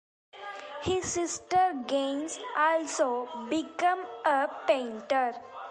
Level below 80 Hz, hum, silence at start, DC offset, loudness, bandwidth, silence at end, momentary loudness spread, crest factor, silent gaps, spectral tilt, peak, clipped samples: -62 dBFS; none; 0.35 s; under 0.1%; -29 LUFS; 11.5 kHz; 0 s; 9 LU; 18 dB; none; -3 dB/octave; -12 dBFS; under 0.1%